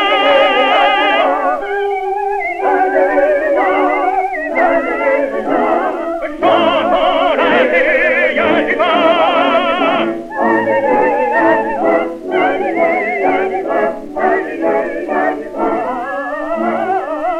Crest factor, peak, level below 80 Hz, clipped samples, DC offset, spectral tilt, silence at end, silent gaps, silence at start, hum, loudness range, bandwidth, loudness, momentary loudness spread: 12 dB; 0 dBFS; -46 dBFS; under 0.1%; under 0.1%; -5 dB/octave; 0 s; none; 0 s; none; 4 LU; 10.5 kHz; -14 LUFS; 7 LU